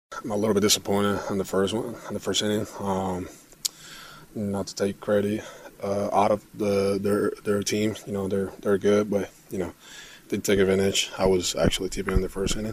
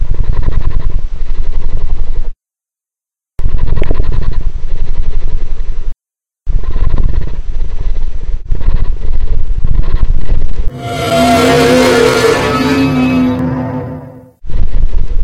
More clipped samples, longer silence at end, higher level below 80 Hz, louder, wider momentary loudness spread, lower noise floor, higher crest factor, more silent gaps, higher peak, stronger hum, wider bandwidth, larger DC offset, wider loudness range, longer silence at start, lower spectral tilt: second, under 0.1% vs 4%; about the same, 0 s vs 0 s; second, -42 dBFS vs -12 dBFS; second, -26 LUFS vs -15 LUFS; second, 12 LU vs 16 LU; second, -45 dBFS vs -88 dBFS; first, 22 dB vs 6 dB; neither; second, -4 dBFS vs 0 dBFS; neither; first, 15.5 kHz vs 10 kHz; neither; second, 4 LU vs 11 LU; about the same, 0.1 s vs 0 s; about the same, -4.5 dB/octave vs -5.5 dB/octave